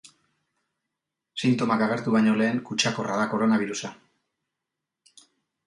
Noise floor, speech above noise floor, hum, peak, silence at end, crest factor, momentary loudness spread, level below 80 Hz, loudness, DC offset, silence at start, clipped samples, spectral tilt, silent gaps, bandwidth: -86 dBFS; 62 dB; none; -6 dBFS; 1.75 s; 22 dB; 10 LU; -70 dBFS; -24 LUFS; under 0.1%; 1.35 s; under 0.1%; -5 dB/octave; none; 11 kHz